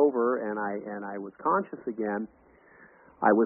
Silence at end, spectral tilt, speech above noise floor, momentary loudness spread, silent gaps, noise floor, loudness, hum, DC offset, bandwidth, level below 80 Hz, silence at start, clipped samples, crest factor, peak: 0 s; -1.5 dB/octave; 25 dB; 11 LU; none; -56 dBFS; -30 LUFS; none; under 0.1%; 2.9 kHz; -72 dBFS; 0 s; under 0.1%; 20 dB; -8 dBFS